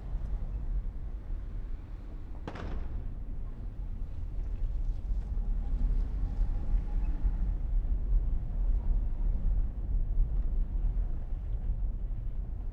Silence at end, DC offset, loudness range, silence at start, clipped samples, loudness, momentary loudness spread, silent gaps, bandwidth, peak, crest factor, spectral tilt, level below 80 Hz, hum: 0 s; under 0.1%; 7 LU; 0 s; under 0.1%; -37 LUFS; 9 LU; none; 2.8 kHz; -18 dBFS; 14 dB; -9.5 dB/octave; -30 dBFS; none